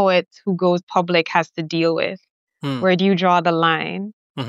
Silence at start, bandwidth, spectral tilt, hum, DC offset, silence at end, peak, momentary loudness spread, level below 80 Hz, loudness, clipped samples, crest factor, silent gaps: 0 s; 7.6 kHz; -6.5 dB/octave; none; under 0.1%; 0 s; -2 dBFS; 11 LU; -74 dBFS; -19 LUFS; under 0.1%; 18 dB; 0.83-0.87 s, 2.31-2.47 s, 4.13-4.35 s